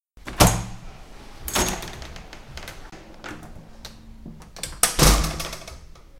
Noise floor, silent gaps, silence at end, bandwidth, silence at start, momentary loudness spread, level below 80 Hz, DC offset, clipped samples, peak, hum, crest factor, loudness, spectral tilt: -43 dBFS; none; 0 s; 17 kHz; 0.15 s; 26 LU; -32 dBFS; under 0.1%; under 0.1%; 0 dBFS; none; 26 dB; -21 LUFS; -3 dB/octave